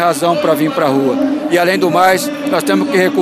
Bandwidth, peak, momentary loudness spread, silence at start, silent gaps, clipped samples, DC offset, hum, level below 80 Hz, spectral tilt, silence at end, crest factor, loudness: 15.5 kHz; 0 dBFS; 5 LU; 0 s; none; under 0.1%; under 0.1%; none; -60 dBFS; -4.5 dB/octave; 0 s; 12 dB; -13 LUFS